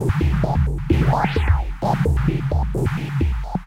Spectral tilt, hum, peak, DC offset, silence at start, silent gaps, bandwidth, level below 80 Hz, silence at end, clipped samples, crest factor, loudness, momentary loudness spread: -8 dB/octave; none; -6 dBFS; under 0.1%; 0 s; none; 13 kHz; -24 dBFS; 0 s; under 0.1%; 14 dB; -21 LUFS; 4 LU